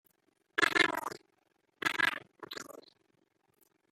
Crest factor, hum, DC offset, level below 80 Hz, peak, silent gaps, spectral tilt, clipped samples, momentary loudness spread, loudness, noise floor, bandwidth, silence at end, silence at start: 26 dB; none; under 0.1%; -78 dBFS; -10 dBFS; none; -1.5 dB/octave; under 0.1%; 19 LU; -31 LUFS; -75 dBFS; 16 kHz; 1.1 s; 0.55 s